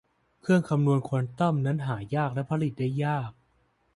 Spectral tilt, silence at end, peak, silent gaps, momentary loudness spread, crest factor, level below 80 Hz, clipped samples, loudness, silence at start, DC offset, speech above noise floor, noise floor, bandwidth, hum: -8.5 dB/octave; 0.65 s; -12 dBFS; none; 6 LU; 16 dB; -62 dBFS; under 0.1%; -27 LUFS; 0.45 s; under 0.1%; 42 dB; -69 dBFS; 11.5 kHz; none